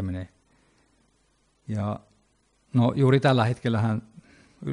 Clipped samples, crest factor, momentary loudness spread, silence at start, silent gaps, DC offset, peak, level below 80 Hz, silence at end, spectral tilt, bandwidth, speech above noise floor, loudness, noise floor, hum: under 0.1%; 18 dB; 18 LU; 0 s; none; under 0.1%; -8 dBFS; -60 dBFS; 0 s; -8 dB/octave; 10.5 kHz; 45 dB; -25 LUFS; -67 dBFS; none